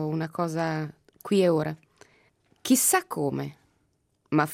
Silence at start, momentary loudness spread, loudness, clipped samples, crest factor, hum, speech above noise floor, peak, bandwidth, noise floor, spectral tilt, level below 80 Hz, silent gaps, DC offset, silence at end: 0 s; 17 LU; -26 LUFS; under 0.1%; 20 dB; none; 45 dB; -8 dBFS; 16 kHz; -71 dBFS; -4.5 dB/octave; -70 dBFS; none; under 0.1%; 0 s